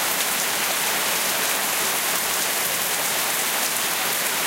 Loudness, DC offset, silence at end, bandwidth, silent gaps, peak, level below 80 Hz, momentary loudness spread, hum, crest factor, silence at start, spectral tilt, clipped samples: -20 LUFS; under 0.1%; 0 s; 17 kHz; none; -6 dBFS; -64 dBFS; 1 LU; none; 18 dB; 0 s; 0.5 dB/octave; under 0.1%